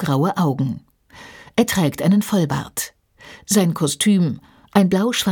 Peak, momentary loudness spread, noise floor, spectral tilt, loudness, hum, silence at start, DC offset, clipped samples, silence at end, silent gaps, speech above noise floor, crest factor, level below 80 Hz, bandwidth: -2 dBFS; 13 LU; -43 dBFS; -5 dB/octave; -19 LUFS; none; 0 s; under 0.1%; under 0.1%; 0 s; none; 25 dB; 18 dB; -54 dBFS; 19 kHz